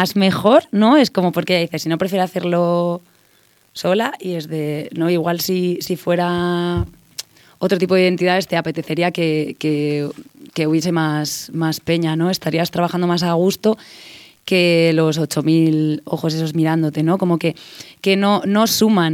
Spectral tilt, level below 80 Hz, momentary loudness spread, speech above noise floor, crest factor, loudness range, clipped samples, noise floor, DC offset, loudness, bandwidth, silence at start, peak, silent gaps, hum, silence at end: -5.5 dB/octave; -48 dBFS; 10 LU; 38 dB; 16 dB; 4 LU; under 0.1%; -55 dBFS; under 0.1%; -18 LUFS; 17.5 kHz; 0 s; -2 dBFS; none; none; 0 s